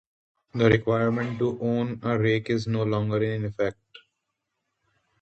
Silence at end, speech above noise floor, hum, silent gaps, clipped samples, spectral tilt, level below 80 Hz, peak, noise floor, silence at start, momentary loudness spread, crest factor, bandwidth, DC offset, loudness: 1.5 s; 56 dB; none; none; under 0.1%; -8 dB/octave; -56 dBFS; -6 dBFS; -81 dBFS; 0.55 s; 7 LU; 20 dB; 8 kHz; under 0.1%; -25 LUFS